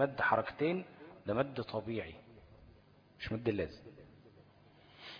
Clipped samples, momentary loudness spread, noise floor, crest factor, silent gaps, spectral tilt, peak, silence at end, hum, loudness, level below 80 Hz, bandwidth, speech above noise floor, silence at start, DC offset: under 0.1%; 22 LU; -63 dBFS; 22 dB; none; -4.5 dB/octave; -16 dBFS; 0 s; none; -37 LUFS; -64 dBFS; 5.2 kHz; 27 dB; 0 s; under 0.1%